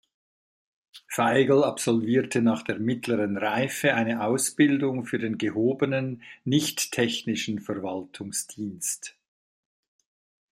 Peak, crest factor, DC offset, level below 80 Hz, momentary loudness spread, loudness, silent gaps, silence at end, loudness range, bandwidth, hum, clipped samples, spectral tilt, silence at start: -8 dBFS; 20 dB; under 0.1%; -70 dBFS; 10 LU; -26 LUFS; none; 1.4 s; 6 LU; 16 kHz; none; under 0.1%; -4.5 dB/octave; 0.95 s